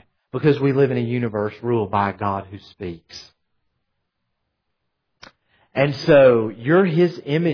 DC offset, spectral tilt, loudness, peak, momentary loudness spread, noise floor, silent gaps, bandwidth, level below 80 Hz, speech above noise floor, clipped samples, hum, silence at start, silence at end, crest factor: under 0.1%; -8 dB/octave; -19 LUFS; -4 dBFS; 19 LU; -75 dBFS; none; 5.4 kHz; -58 dBFS; 56 dB; under 0.1%; none; 0.35 s; 0 s; 16 dB